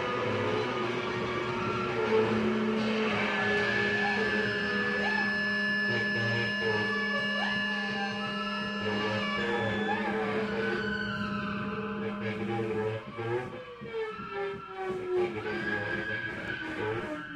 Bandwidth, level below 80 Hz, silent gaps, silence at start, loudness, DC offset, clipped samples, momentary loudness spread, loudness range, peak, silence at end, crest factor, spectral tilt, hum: 10.5 kHz; -58 dBFS; none; 0 s; -30 LUFS; under 0.1%; under 0.1%; 8 LU; 6 LU; -16 dBFS; 0 s; 16 dB; -5.5 dB/octave; none